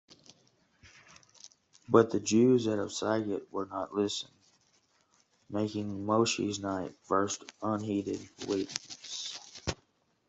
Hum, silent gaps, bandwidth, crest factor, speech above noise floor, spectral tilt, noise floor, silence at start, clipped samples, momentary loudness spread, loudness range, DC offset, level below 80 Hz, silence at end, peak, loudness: none; none; 8.2 kHz; 26 dB; 40 dB; -5 dB/octave; -71 dBFS; 0.85 s; under 0.1%; 14 LU; 6 LU; under 0.1%; -64 dBFS; 0.55 s; -8 dBFS; -32 LUFS